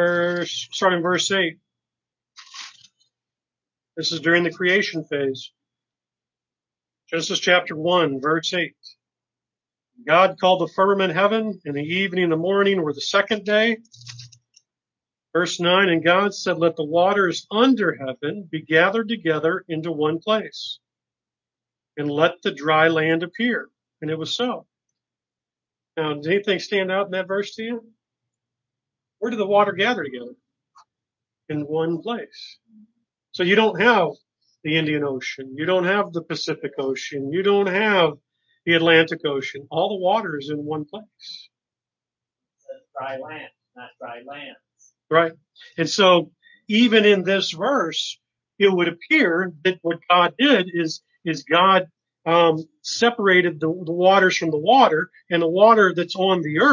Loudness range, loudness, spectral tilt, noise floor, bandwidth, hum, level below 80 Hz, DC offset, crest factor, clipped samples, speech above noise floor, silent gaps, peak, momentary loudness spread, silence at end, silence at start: 8 LU; -20 LUFS; -4.5 dB/octave; under -90 dBFS; 7.6 kHz; none; -74 dBFS; under 0.1%; 20 dB; under 0.1%; over 70 dB; none; -2 dBFS; 17 LU; 0 s; 0 s